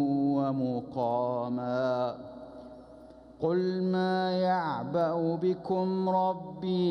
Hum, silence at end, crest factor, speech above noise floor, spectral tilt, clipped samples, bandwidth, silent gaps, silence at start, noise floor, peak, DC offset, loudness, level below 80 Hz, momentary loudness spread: none; 0 s; 14 dB; 22 dB; -8.5 dB/octave; under 0.1%; 6.2 kHz; none; 0 s; -51 dBFS; -16 dBFS; under 0.1%; -30 LUFS; -66 dBFS; 14 LU